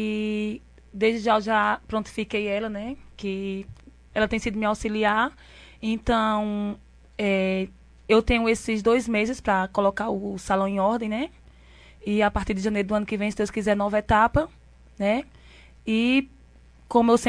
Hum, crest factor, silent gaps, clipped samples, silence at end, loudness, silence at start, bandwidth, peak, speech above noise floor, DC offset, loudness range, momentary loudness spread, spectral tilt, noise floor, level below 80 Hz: none; 20 dB; none; under 0.1%; 0 s; -25 LUFS; 0 s; 11 kHz; -6 dBFS; 28 dB; under 0.1%; 4 LU; 13 LU; -5.5 dB/octave; -52 dBFS; -44 dBFS